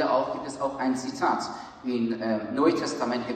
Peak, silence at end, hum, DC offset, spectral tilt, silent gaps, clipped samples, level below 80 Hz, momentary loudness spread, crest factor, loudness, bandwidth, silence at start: -10 dBFS; 0 s; none; under 0.1%; -5 dB/octave; none; under 0.1%; -64 dBFS; 8 LU; 18 dB; -28 LUFS; 9.4 kHz; 0 s